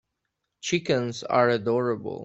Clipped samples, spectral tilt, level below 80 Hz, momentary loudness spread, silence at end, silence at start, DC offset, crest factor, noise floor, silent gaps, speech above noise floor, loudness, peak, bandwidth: under 0.1%; -5 dB/octave; -66 dBFS; 6 LU; 0 s; 0.65 s; under 0.1%; 20 dB; -81 dBFS; none; 56 dB; -25 LUFS; -6 dBFS; 8.2 kHz